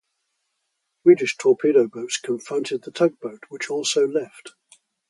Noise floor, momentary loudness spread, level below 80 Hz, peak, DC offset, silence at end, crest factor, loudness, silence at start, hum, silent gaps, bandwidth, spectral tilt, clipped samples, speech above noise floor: -76 dBFS; 14 LU; -76 dBFS; -2 dBFS; under 0.1%; 0.6 s; 20 dB; -21 LUFS; 1.05 s; none; none; 11.5 kHz; -4 dB/octave; under 0.1%; 55 dB